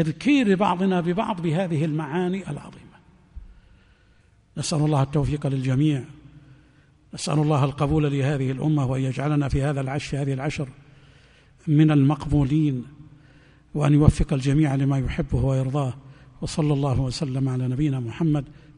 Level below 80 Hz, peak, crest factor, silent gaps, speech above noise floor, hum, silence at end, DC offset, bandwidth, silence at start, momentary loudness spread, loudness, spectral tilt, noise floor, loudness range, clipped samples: -40 dBFS; 0 dBFS; 24 dB; none; 35 dB; none; 0.25 s; under 0.1%; 10.5 kHz; 0 s; 11 LU; -23 LUFS; -7 dB/octave; -57 dBFS; 6 LU; under 0.1%